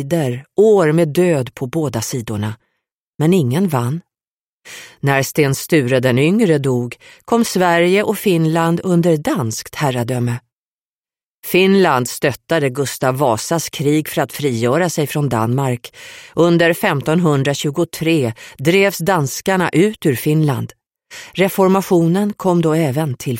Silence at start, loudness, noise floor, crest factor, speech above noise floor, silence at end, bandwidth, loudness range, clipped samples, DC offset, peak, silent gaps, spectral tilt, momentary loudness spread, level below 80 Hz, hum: 0 s; -16 LUFS; under -90 dBFS; 14 dB; over 74 dB; 0 s; 16.5 kHz; 3 LU; under 0.1%; under 0.1%; -2 dBFS; 2.92-3.14 s, 4.31-4.61 s, 10.53-11.03 s, 11.25-11.43 s; -5.5 dB/octave; 10 LU; -54 dBFS; none